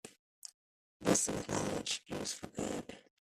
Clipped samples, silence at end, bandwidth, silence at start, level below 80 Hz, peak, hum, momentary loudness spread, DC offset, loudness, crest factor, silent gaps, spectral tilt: under 0.1%; 0.2 s; 15.5 kHz; 0.05 s; -64 dBFS; -16 dBFS; none; 21 LU; under 0.1%; -36 LUFS; 22 dB; 0.19-0.42 s, 0.54-1.00 s; -3 dB/octave